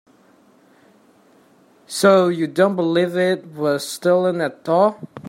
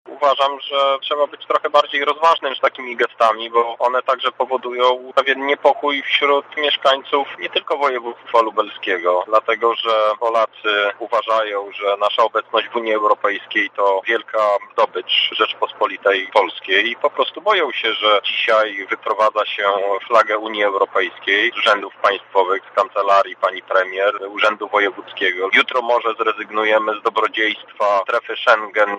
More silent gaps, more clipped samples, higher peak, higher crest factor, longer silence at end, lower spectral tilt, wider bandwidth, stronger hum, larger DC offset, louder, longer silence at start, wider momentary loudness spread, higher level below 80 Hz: neither; neither; about the same, -2 dBFS vs -2 dBFS; about the same, 18 dB vs 16 dB; about the same, 0 s vs 0 s; first, -5.5 dB/octave vs -2 dB/octave; first, 16 kHz vs 9.6 kHz; neither; neither; about the same, -18 LUFS vs -17 LUFS; first, 1.9 s vs 0.05 s; first, 8 LU vs 5 LU; first, -70 dBFS vs -76 dBFS